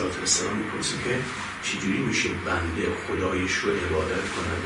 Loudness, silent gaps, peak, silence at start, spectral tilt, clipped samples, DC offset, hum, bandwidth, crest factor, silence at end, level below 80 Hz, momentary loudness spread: -26 LUFS; none; -10 dBFS; 0 s; -3.5 dB/octave; under 0.1%; under 0.1%; none; 11 kHz; 16 dB; 0 s; -50 dBFS; 5 LU